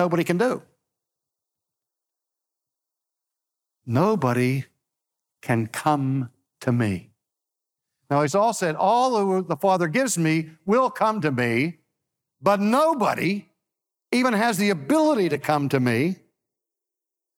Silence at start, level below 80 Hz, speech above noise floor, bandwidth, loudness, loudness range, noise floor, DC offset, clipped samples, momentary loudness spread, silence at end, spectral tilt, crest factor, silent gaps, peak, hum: 0 s; -70 dBFS; 65 dB; 17.5 kHz; -22 LUFS; 6 LU; -87 dBFS; under 0.1%; under 0.1%; 7 LU; 1.25 s; -6 dB/octave; 18 dB; none; -6 dBFS; none